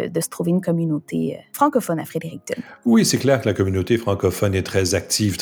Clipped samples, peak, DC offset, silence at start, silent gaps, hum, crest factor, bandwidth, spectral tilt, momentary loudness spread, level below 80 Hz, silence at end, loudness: under 0.1%; -2 dBFS; under 0.1%; 0 s; none; none; 18 dB; over 20 kHz; -5 dB/octave; 10 LU; -52 dBFS; 0 s; -20 LUFS